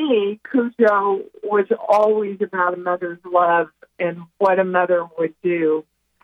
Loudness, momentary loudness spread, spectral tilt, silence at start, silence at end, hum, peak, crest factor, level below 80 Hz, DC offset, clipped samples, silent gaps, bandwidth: -20 LUFS; 9 LU; -7 dB/octave; 0 s; 0.45 s; none; -4 dBFS; 14 dB; -68 dBFS; under 0.1%; under 0.1%; none; 9 kHz